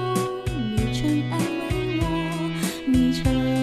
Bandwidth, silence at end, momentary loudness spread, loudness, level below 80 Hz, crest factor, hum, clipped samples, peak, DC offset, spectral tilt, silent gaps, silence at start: 14 kHz; 0 s; 5 LU; -24 LUFS; -36 dBFS; 14 dB; none; under 0.1%; -10 dBFS; under 0.1%; -6 dB/octave; none; 0 s